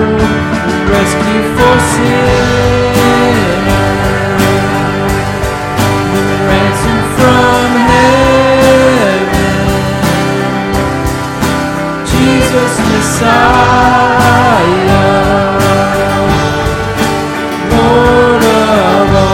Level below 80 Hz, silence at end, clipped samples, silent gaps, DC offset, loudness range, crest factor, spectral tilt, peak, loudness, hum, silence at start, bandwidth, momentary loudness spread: -24 dBFS; 0 s; 2%; none; under 0.1%; 3 LU; 8 dB; -5.5 dB/octave; 0 dBFS; -9 LUFS; none; 0 s; 17 kHz; 6 LU